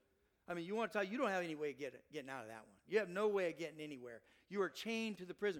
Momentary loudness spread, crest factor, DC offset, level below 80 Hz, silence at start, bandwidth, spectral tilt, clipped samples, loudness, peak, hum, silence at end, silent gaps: 13 LU; 20 dB; under 0.1%; -84 dBFS; 0.5 s; 16.5 kHz; -5 dB/octave; under 0.1%; -42 LUFS; -22 dBFS; none; 0 s; none